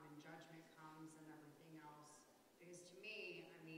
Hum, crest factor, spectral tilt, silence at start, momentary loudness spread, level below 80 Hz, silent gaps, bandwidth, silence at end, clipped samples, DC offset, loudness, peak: none; 18 dB; -4 dB/octave; 0 s; 11 LU; under -90 dBFS; none; 15.5 kHz; 0 s; under 0.1%; under 0.1%; -59 LUFS; -42 dBFS